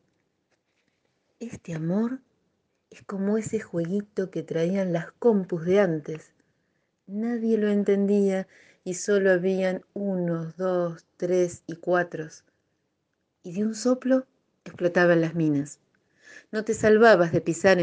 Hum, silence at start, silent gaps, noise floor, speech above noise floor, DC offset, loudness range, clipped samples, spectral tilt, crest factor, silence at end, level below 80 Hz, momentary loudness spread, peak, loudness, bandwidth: none; 1.4 s; none; -76 dBFS; 52 dB; under 0.1%; 6 LU; under 0.1%; -6.5 dB/octave; 22 dB; 0 s; -68 dBFS; 16 LU; -4 dBFS; -25 LUFS; 9.6 kHz